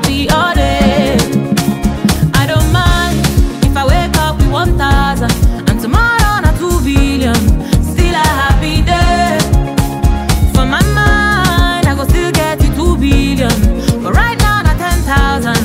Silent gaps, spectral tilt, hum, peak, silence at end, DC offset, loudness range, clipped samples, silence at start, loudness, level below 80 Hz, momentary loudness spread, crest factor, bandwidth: none; -5 dB/octave; none; 0 dBFS; 0 s; under 0.1%; 1 LU; under 0.1%; 0 s; -12 LUFS; -16 dBFS; 3 LU; 10 dB; 16.5 kHz